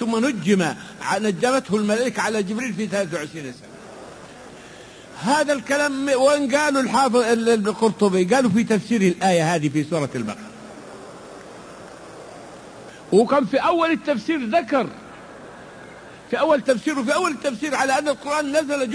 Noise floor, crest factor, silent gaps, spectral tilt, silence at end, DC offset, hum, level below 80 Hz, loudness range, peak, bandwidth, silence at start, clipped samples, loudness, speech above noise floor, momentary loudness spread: -42 dBFS; 16 dB; none; -5 dB/octave; 0 s; under 0.1%; none; -60 dBFS; 8 LU; -4 dBFS; 11 kHz; 0 s; under 0.1%; -20 LUFS; 22 dB; 22 LU